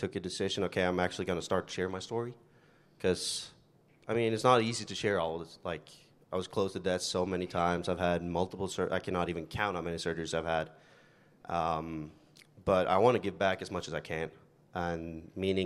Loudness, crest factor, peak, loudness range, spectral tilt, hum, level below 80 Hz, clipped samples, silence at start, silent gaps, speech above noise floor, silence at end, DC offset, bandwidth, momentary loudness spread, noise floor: -33 LUFS; 22 dB; -10 dBFS; 3 LU; -5 dB/octave; none; -64 dBFS; under 0.1%; 0 s; none; 32 dB; 0 s; under 0.1%; 13 kHz; 12 LU; -64 dBFS